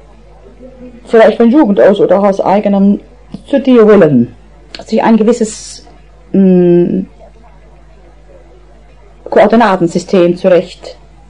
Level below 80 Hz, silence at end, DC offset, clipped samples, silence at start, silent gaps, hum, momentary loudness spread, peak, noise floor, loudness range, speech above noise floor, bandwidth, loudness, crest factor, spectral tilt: -40 dBFS; 0.4 s; 0.7%; under 0.1%; 0.65 s; none; none; 12 LU; 0 dBFS; -39 dBFS; 6 LU; 31 dB; 10.5 kHz; -9 LUFS; 10 dB; -7 dB/octave